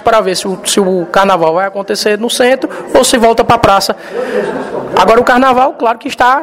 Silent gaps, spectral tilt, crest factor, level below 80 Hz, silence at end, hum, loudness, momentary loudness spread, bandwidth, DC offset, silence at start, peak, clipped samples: none; -3.5 dB/octave; 10 dB; -40 dBFS; 0 s; none; -10 LUFS; 8 LU; 16.5 kHz; under 0.1%; 0 s; 0 dBFS; 0.5%